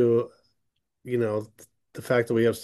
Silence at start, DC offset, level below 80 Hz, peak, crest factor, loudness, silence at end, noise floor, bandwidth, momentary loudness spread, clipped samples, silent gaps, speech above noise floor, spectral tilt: 0 s; under 0.1%; -68 dBFS; -10 dBFS; 16 dB; -26 LUFS; 0 s; -79 dBFS; 12.5 kHz; 22 LU; under 0.1%; none; 55 dB; -7 dB/octave